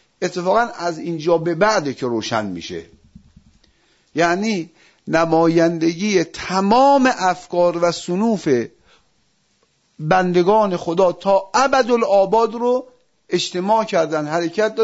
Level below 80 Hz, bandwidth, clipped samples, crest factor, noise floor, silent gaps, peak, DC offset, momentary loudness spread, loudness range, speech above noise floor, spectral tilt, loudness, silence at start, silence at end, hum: -56 dBFS; 8 kHz; under 0.1%; 16 dB; -63 dBFS; none; -2 dBFS; under 0.1%; 9 LU; 5 LU; 46 dB; -5 dB/octave; -18 LUFS; 0.2 s; 0 s; none